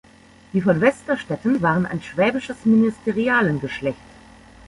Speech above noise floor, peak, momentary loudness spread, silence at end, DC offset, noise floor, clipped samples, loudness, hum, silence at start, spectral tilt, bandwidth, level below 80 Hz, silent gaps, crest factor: 28 dB; -2 dBFS; 9 LU; 0.75 s; under 0.1%; -48 dBFS; under 0.1%; -20 LUFS; none; 0.55 s; -7 dB/octave; 11 kHz; -52 dBFS; none; 18 dB